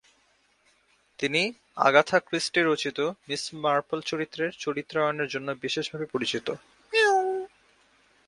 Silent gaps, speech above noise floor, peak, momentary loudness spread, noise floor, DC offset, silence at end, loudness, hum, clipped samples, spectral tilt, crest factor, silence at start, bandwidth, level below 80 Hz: none; 39 dB; -4 dBFS; 11 LU; -66 dBFS; under 0.1%; 0.8 s; -26 LUFS; none; under 0.1%; -3.5 dB/octave; 24 dB; 1.2 s; 11.5 kHz; -70 dBFS